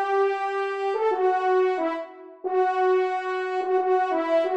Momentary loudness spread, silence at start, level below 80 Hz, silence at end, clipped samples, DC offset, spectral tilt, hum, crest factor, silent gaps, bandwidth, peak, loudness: 6 LU; 0 s; -80 dBFS; 0 s; under 0.1%; under 0.1%; -3.5 dB/octave; none; 12 dB; none; 7.8 kHz; -12 dBFS; -24 LUFS